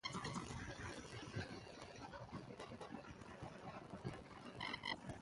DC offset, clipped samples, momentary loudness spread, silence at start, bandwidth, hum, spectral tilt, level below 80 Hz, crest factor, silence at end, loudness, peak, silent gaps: under 0.1%; under 0.1%; 9 LU; 0.05 s; 11.5 kHz; none; -4.5 dB/octave; -66 dBFS; 20 dB; 0 s; -51 LUFS; -32 dBFS; none